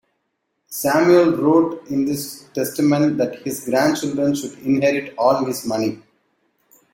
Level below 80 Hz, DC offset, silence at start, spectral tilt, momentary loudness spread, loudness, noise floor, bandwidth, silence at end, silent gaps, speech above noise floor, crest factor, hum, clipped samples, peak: -60 dBFS; under 0.1%; 0.7 s; -5.5 dB/octave; 11 LU; -19 LUFS; -73 dBFS; 16.5 kHz; 0.95 s; none; 55 dB; 16 dB; none; under 0.1%; -2 dBFS